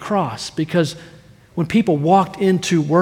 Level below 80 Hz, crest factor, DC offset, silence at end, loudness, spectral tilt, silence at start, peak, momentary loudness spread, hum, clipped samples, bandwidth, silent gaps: -54 dBFS; 16 dB; under 0.1%; 0 s; -18 LUFS; -6 dB/octave; 0 s; -2 dBFS; 10 LU; none; under 0.1%; 15 kHz; none